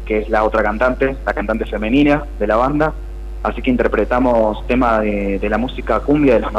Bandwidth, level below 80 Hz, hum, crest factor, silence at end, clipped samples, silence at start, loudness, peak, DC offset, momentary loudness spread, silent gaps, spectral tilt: 10.5 kHz; -26 dBFS; none; 12 dB; 0 s; under 0.1%; 0 s; -17 LUFS; -4 dBFS; under 0.1%; 6 LU; none; -7.5 dB/octave